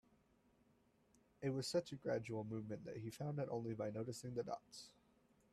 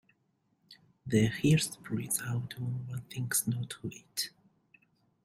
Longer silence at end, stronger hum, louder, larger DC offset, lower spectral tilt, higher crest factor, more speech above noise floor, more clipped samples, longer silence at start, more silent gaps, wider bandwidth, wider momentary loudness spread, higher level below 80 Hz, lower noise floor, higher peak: second, 0.6 s vs 0.95 s; neither; second, -46 LUFS vs -32 LUFS; neither; first, -6 dB/octave vs -4.5 dB/octave; about the same, 20 dB vs 20 dB; second, 31 dB vs 43 dB; neither; first, 1.4 s vs 0.7 s; neither; second, 14 kHz vs 16 kHz; second, 8 LU vs 12 LU; second, -78 dBFS vs -64 dBFS; about the same, -76 dBFS vs -75 dBFS; second, -28 dBFS vs -14 dBFS